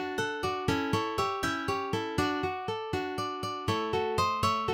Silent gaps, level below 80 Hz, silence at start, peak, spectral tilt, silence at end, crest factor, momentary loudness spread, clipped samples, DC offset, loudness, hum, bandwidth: none; -52 dBFS; 0 s; -14 dBFS; -5 dB/octave; 0 s; 18 dB; 5 LU; under 0.1%; under 0.1%; -31 LUFS; none; 17 kHz